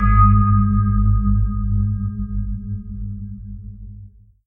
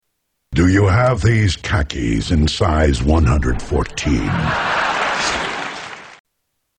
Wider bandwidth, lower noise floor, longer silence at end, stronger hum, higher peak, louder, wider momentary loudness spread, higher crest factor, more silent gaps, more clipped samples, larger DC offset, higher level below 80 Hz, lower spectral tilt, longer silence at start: second, 2.6 kHz vs 10 kHz; second, -42 dBFS vs -72 dBFS; second, 0.4 s vs 0.65 s; neither; about the same, -2 dBFS vs -2 dBFS; about the same, -19 LUFS vs -17 LUFS; first, 22 LU vs 9 LU; about the same, 16 dB vs 14 dB; neither; neither; neither; about the same, -22 dBFS vs -24 dBFS; first, -13 dB/octave vs -5.5 dB/octave; second, 0 s vs 0.5 s